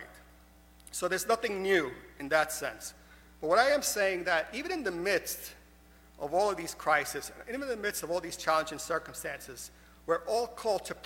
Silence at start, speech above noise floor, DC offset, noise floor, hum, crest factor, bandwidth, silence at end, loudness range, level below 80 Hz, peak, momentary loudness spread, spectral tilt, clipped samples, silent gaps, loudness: 0 s; 26 dB; under 0.1%; -58 dBFS; none; 22 dB; 17 kHz; 0 s; 4 LU; -60 dBFS; -10 dBFS; 14 LU; -2.5 dB/octave; under 0.1%; none; -31 LUFS